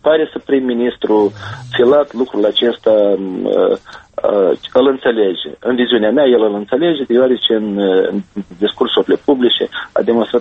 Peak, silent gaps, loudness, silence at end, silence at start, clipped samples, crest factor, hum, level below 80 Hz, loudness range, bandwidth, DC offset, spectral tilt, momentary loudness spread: 0 dBFS; none; -14 LUFS; 0 s; 0.05 s; under 0.1%; 14 dB; none; -54 dBFS; 1 LU; 7 kHz; under 0.1%; -6.5 dB/octave; 7 LU